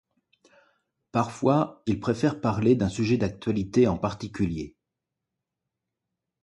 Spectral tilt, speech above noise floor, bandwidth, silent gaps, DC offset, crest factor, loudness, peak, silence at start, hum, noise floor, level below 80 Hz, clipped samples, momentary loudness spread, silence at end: -7.5 dB/octave; 60 dB; 11 kHz; none; under 0.1%; 20 dB; -26 LUFS; -8 dBFS; 1.15 s; none; -85 dBFS; -50 dBFS; under 0.1%; 7 LU; 1.75 s